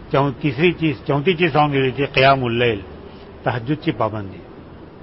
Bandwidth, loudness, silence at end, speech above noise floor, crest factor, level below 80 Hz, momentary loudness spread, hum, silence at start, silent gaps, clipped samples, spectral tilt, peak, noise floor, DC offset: 5.8 kHz; -18 LUFS; 0.05 s; 21 dB; 18 dB; -44 dBFS; 19 LU; none; 0 s; none; under 0.1%; -10.5 dB/octave; -2 dBFS; -39 dBFS; under 0.1%